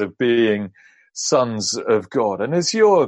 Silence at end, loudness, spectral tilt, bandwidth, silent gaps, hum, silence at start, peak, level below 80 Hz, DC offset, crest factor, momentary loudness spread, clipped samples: 0 s; -19 LUFS; -4 dB/octave; 11 kHz; none; none; 0 s; -4 dBFS; -64 dBFS; under 0.1%; 16 dB; 9 LU; under 0.1%